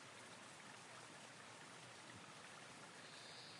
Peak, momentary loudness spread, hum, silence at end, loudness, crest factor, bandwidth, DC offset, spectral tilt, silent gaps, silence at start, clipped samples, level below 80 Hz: -44 dBFS; 1 LU; none; 0 s; -57 LUFS; 14 dB; 12 kHz; under 0.1%; -2 dB/octave; none; 0 s; under 0.1%; under -90 dBFS